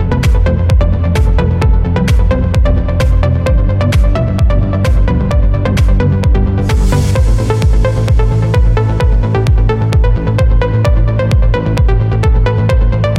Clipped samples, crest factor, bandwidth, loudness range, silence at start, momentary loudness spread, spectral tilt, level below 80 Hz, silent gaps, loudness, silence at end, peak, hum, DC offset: under 0.1%; 8 dB; 11.5 kHz; 0 LU; 0 s; 1 LU; -7.5 dB/octave; -12 dBFS; none; -12 LUFS; 0 s; -2 dBFS; none; under 0.1%